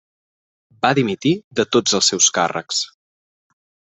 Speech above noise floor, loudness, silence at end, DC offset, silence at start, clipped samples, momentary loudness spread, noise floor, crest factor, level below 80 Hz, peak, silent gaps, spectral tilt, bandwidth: over 72 dB; -17 LUFS; 1.1 s; under 0.1%; 0.85 s; under 0.1%; 9 LU; under -90 dBFS; 20 dB; -62 dBFS; 0 dBFS; 1.44-1.51 s; -2.5 dB/octave; 8.4 kHz